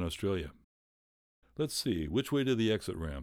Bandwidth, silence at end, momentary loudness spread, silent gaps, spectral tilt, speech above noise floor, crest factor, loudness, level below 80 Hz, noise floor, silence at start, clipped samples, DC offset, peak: over 20 kHz; 0 s; 9 LU; 0.64-1.42 s; -5.5 dB/octave; over 57 dB; 16 dB; -33 LUFS; -50 dBFS; under -90 dBFS; 0 s; under 0.1%; under 0.1%; -18 dBFS